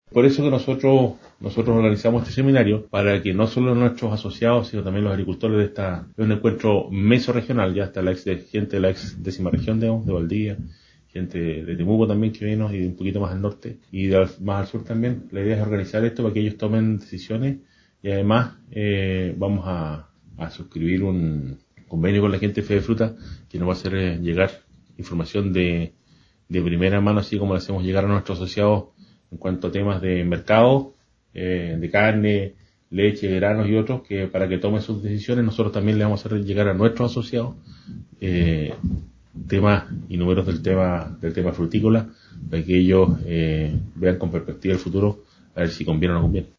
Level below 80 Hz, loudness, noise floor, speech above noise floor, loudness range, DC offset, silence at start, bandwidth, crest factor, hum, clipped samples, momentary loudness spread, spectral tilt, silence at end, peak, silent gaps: -38 dBFS; -22 LUFS; -57 dBFS; 36 dB; 4 LU; under 0.1%; 0.1 s; 7.2 kHz; 20 dB; none; under 0.1%; 11 LU; -8.5 dB/octave; 0.1 s; -2 dBFS; none